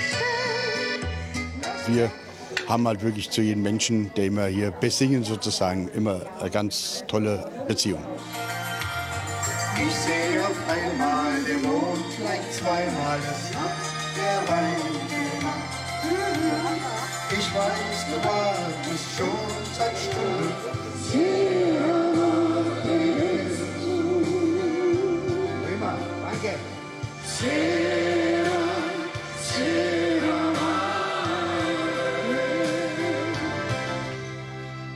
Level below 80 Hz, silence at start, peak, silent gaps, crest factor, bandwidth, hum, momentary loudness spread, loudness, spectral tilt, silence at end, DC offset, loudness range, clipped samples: -56 dBFS; 0 s; -6 dBFS; none; 18 dB; 15 kHz; none; 7 LU; -26 LUFS; -4.5 dB/octave; 0 s; under 0.1%; 3 LU; under 0.1%